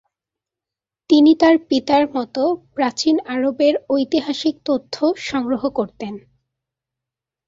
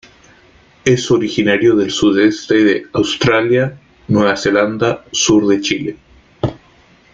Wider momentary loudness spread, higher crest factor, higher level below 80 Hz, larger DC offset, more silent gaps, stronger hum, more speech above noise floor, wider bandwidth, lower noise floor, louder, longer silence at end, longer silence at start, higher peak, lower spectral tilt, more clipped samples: about the same, 10 LU vs 9 LU; about the same, 16 dB vs 14 dB; second, -58 dBFS vs -46 dBFS; neither; neither; neither; first, 70 dB vs 35 dB; about the same, 7.6 kHz vs 7.8 kHz; first, -88 dBFS vs -48 dBFS; second, -18 LUFS vs -14 LUFS; first, 1.3 s vs 0.55 s; first, 1.1 s vs 0.85 s; about the same, -2 dBFS vs -2 dBFS; about the same, -4.5 dB/octave vs -4.5 dB/octave; neither